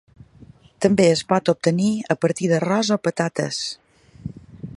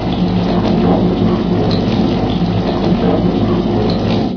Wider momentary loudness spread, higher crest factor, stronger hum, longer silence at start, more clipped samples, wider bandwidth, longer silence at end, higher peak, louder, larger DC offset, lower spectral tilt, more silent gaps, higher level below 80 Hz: first, 20 LU vs 3 LU; first, 20 dB vs 12 dB; neither; first, 0.8 s vs 0 s; neither; first, 11.5 kHz vs 5.4 kHz; about the same, 0 s vs 0 s; about the same, -2 dBFS vs 0 dBFS; second, -20 LUFS vs -14 LUFS; neither; second, -5.5 dB/octave vs -8.5 dB/octave; neither; second, -56 dBFS vs -28 dBFS